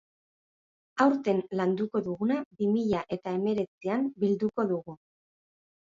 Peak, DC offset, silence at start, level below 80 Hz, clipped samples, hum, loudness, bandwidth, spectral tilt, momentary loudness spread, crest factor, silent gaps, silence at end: -8 dBFS; under 0.1%; 0.95 s; -68 dBFS; under 0.1%; none; -29 LUFS; 7.6 kHz; -8 dB/octave; 6 LU; 20 dB; 2.45-2.51 s, 3.68-3.81 s; 1 s